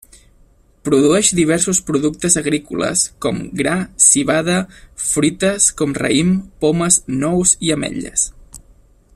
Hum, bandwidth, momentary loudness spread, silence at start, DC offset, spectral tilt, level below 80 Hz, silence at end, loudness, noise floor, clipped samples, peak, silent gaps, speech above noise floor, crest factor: none; 15 kHz; 9 LU; 0.85 s; under 0.1%; -3.5 dB/octave; -44 dBFS; 0.6 s; -15 LUFS; -51 dBFS; under 0.1%; 0 dBFS; none; 35 dB; 18 dB